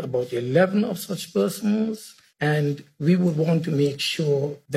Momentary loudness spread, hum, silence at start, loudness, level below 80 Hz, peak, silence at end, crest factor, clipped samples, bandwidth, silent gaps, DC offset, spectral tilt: 7 LU; none; 0 s; -23 LUFS; -66 dBFS; -4 dBFS; 0 s; 18 dB; under 0.1%; 15 kHz; none; under 0.1%; -6 dB/octave